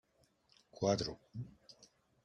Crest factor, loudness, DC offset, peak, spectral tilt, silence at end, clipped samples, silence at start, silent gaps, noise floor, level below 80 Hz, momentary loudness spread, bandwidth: 22 dB; -39 LUFS; under 0.1%; -20 dBFS; -5 dB/octave; 0.4 s; under 0.1%; 0.75 s; none; -73 dBFS; -68 dBFS; 25 LU; 11 kHz